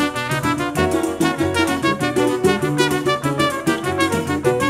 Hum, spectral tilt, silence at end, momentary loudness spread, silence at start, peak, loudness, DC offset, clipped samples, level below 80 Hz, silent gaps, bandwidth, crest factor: none; -5 dB/octave; 0 s; 3 LU; 0 s; -2 dBFS; -19 LUFS; under 0.1%; under 0.1%; -44 dBFS; none; 16 kHz; 18 dB